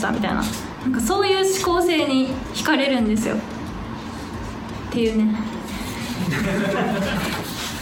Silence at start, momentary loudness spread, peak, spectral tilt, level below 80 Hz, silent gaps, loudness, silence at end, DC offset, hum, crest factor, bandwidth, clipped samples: 0 s; 13 LU; -6 dBFS; -4.5 dB/octave; -40 dBFS; none; -22 LUFS; 0 s; under 0.1%; none; 16 dB; 19.5 kHz; under 0.1%